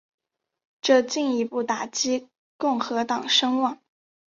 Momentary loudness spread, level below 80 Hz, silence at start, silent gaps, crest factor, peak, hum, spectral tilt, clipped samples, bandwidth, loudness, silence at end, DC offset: 8 LU; -72 dBFS; 0.85 s; 2.38-2.59 s; 20 dB; -6 dBFS; none; -2 dB/octave; under 0.1%; 7.6 kHz; -24 LUFS; 0.55 s; under 0.1%